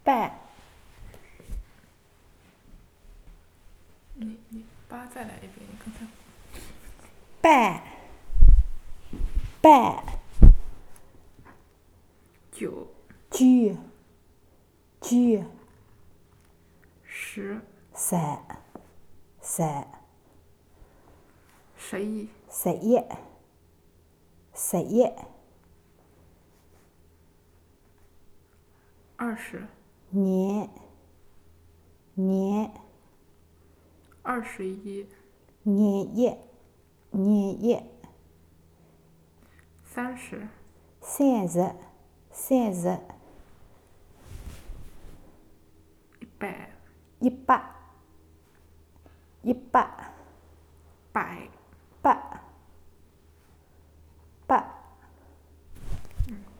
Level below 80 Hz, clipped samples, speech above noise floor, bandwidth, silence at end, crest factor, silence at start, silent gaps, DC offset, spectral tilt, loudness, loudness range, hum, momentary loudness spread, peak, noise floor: -30 dBFS; under 0.1%; 36 dB; 15 kHz; 0.2 s; 26 dB; 0.05 s; none; under 0.1%; -6 dB/octave; -26 LUFS; 19 LU; none; 26 LU; 0 dBFS; -60 dBFS